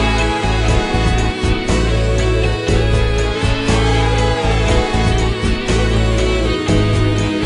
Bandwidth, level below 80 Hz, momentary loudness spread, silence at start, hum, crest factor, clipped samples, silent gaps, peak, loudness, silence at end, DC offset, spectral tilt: 11 kHz; -18 dBFS; 2 LU; 0 s; none; 12 dB; under 0.1%; none; -2 dBFS; -16 LUFS; 0 s; under 0.1%; -5.5 dB/octave